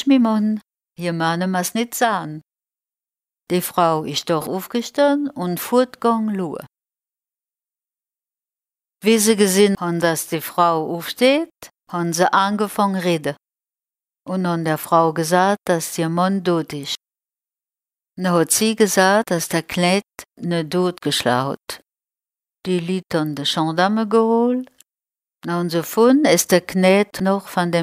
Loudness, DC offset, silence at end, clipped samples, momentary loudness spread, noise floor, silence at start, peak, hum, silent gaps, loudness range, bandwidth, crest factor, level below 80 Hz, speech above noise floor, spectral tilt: -19 LUFS; under 0.1%; 0 s; under 0.1%; 11 LU; under -90 dBFS; 0 s; -2 dBFS; none; none; 5 LU; 16 kHz; 18 dB; -62 dBFS; over 72 dB; -4.5 dB/octave